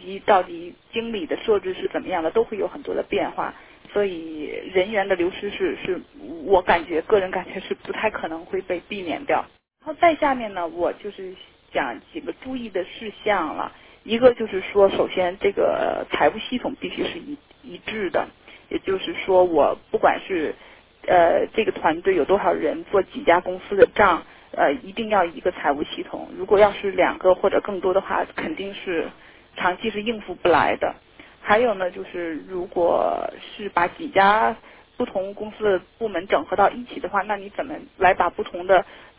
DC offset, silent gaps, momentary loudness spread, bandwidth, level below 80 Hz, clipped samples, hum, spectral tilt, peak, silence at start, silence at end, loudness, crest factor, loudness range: under 0.1%; none; 13 LU; 4 kHz; -52 dBFS; under 0.1%; none; -8.5 dB/octave; -2 dBFS; 0 s; 0.15 s; -22 LUFS; 20 dB; 5 LU